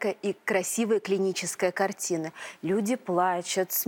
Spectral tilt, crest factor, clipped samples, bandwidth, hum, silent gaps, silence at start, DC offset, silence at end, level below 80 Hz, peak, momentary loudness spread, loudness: -3.5 dB/octave; 16 dB; under 0.1%; 17.5 kHz; none; none; 0 s; under 0.1%; 0 s; -78 dBFS; -12 dBFS; 5 LU; -28 LUFS